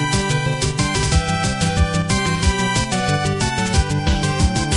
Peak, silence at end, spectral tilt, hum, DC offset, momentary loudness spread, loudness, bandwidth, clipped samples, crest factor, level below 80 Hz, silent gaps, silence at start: -4 dBFS; 0 s; -4.5 dB/octave; none; under 0.1%; 2 LU; -19 LUFS; 11.5 kHz; under 0.1%; 14 dB; -24 dBFS; none; 0 s